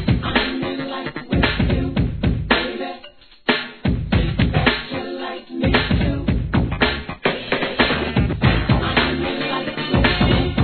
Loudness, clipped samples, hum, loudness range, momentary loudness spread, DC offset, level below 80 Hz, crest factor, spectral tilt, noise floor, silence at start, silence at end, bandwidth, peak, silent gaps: -20 LUFS; under 0.1%; none; 2 LU; 9 LU; 0.3%; -28 dBFS; 18 dB; -9 dB/octave; -44 dBFS; 0 s; 0 s; 4.6 kHz; -2 dBFS; none